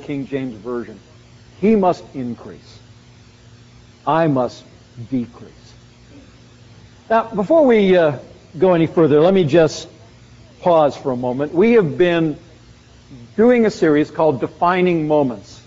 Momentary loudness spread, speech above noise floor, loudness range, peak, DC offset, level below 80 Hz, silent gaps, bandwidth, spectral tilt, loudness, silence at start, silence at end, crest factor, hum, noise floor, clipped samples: 16 LU; 29 dB; 9 LU; -2 dBFS; under 0.1%; -52 dBFS; none; 7.6 kHz; -6 dB/octave; -16 LUFS; 0 s; 0.15 s; 16 dB; none; -45 dBFS; under 0.1%